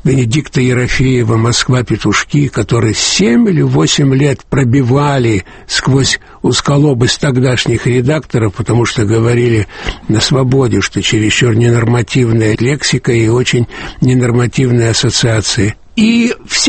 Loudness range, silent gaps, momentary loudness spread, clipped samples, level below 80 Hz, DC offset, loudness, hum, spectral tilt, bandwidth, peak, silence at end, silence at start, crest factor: 1 LU; none; 4 LU; under 0.1%; -32 dBFS; under 0.1%; -11 LUFS; none; -5 dB/octave; 8.8 kHz; 0 dBFS; 0 s; 0.05 s; 10 dB